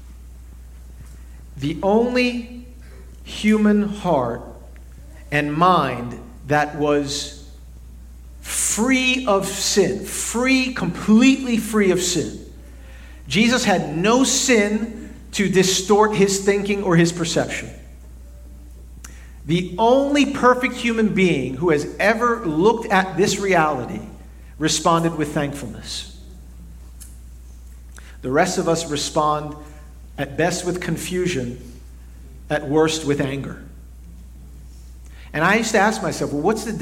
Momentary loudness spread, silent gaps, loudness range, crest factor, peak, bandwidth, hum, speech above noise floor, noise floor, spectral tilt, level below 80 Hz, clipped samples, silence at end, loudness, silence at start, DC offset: 18 LU; none; 7 LU; 18 dB; -2 dBFS; 16.5 kHz; none; 20 dB; -39 dBFS; -4 dB/octave; -40 dBFS; under 0.1%; 0 s; -19 LUFS; 0 s; under 0.1%